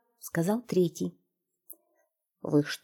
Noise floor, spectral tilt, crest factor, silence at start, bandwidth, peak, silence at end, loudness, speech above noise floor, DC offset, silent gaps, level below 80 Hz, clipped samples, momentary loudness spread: -79 dBFS; -6 dB/octave; 20 dB; 0.25 s; 19 kHz; -12 dBFS; 0.1 s; -30 LUFS; 50 dB; under 0.1%; none; -74 dBFS; under 0.1%; 23 LU